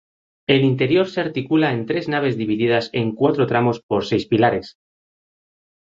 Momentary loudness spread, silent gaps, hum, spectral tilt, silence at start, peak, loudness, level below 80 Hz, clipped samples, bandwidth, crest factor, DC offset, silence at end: 6 LU; 3.83-3.89 s; none; -7.5 dB/octave; 0.5 s; -2 dBFS; -19 LUFS; -54 dBFS; under 0.1%; 7.6 kHz; 18 dB; under 0.1%; 1.25 s